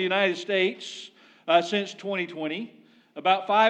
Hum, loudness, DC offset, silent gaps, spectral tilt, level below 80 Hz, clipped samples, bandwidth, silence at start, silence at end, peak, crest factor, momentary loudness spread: none; -26 LUFS; under 0.1%; none; -4 dB/octave; under -90 dBFS; under 0.1%; 9.2 kHz; 0 s; 0 s; -8 dBFS; 18 dB; 18 LU